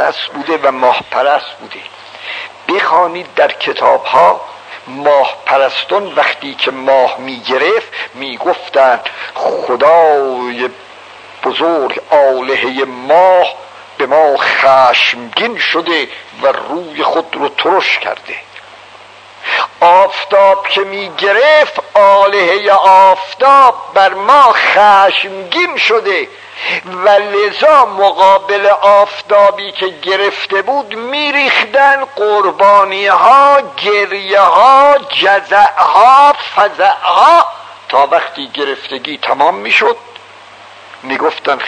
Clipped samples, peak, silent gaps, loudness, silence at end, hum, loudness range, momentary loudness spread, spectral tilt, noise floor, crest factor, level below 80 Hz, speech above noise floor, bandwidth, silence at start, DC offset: 1%; 0 dBFS; none; -10 LUFS; 0 s; none; 6 LU; 13 LU; -3 dB/octave; -36 dBFS; 10 dB; -62 dBFS; 26 dB; 11 kHz; 0 s; under 0.1%